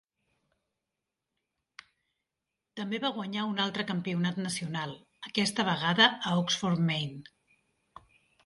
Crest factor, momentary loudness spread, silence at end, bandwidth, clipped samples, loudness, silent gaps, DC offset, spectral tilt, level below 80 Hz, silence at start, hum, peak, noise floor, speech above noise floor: 24 dB; 16 LU; 1.25 s; 11.5 kHz; under 0.1%; -29 LUFS; none; under 0.1%; -4 dB/octave; -72 dBFS; 2.75 s; none; -8 dBFS; -87 dBFS; 57 dB